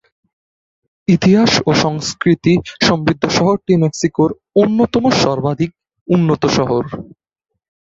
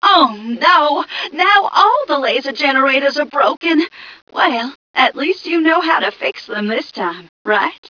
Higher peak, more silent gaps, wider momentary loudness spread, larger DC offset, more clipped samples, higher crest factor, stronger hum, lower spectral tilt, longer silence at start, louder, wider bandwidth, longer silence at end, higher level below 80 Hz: about the same, 0 dBFS vs 0 dBFS; second, 6.01-6.06 s vs 3.57-3.61 s, 4.22-4.27 s, 4.75-4.94 s, 7.29-7.45 s; second, 7 LU vs 11 LU; neither; neither; about the same, 14 dB vs 14 dB; neither; first, -5.5 dB/octave vs -4 dB/octave; first, 1.1 s vs 0 s; about the same, -15 LUFS vs -15 LUFS; first, 7.8 kHz vs 5.4 kHz; first, 0.9 s vs 0.15 s; first, -46 dBFS vs -66 dBFS